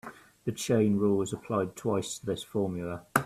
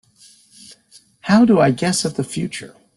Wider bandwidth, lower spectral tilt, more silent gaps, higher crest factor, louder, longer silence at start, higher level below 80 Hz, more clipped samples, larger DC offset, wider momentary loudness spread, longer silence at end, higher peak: first, 15 kHz vs 12.5 kHz; about the same, -5.5 dB/octave vs -5 dB/octave; neither; first, 24 dB vs 16 dB; second, -30 LUFS vs -17 LUFS; second, 0.05 s vs 1.25 s; second, -62 dBFS vs -56 dBFS; neither; neither; second, 11 LU vs 16 LU; second, 0 s vs 0.3 s; about the same, -6 dBFS vs -4 dBFS